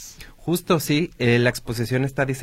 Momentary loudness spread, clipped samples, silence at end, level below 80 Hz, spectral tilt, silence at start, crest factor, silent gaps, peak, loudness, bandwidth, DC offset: 9 LU; under 0.1%; 0 s; -48 dBFS; -5.5 dB/octave; 0 s; 18 dB; none; -6 dBFS; -22 LUFS; 16.5 kHz; under 0.1%